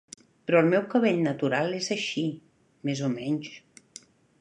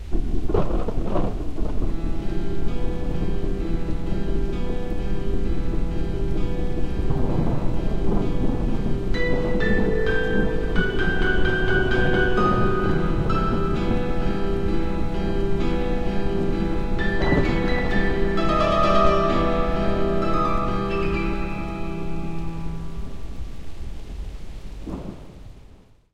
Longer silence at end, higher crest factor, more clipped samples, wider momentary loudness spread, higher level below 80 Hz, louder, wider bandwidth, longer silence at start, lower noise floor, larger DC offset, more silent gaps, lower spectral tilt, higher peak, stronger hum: first, 0.85 s vs 0.6 s; about the same, 20 dB vs 16 dB; neither; first, 19 LU vs 13 LU; second, -74 dBFS vs -26 dBFS; about the same, -26 LUFS vs -24 LUFS; first, 11 kHz vs 7.6 kHz; first, 0.5 s vs 0 s; first, -52 dBFS vs -48 dBFS; neither; neither; second, -5.5 dB/octave vs -7.5 dB/octave; about the same, -8 dBFS vs -6 dBFS; neither